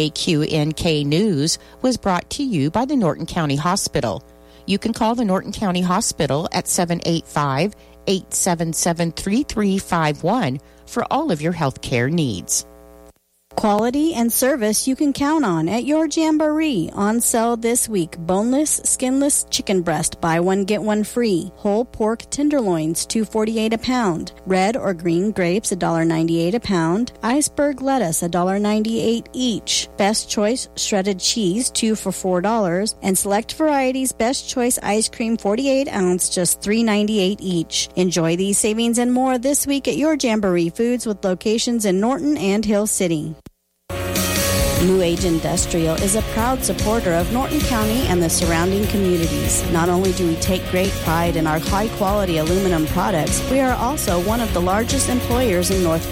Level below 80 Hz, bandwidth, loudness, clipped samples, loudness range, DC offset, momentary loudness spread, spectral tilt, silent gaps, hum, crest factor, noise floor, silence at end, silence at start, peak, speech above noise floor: -36 dBFS; 16.5 kHz; -19 LUFS; under 0.1%; 2 LU; under 0.1%; 4 LU; -4.5 dB/octave; none; none; 14 dB; -50 dBFS; 0 s; 0 s; -4 dBFS; 31 dB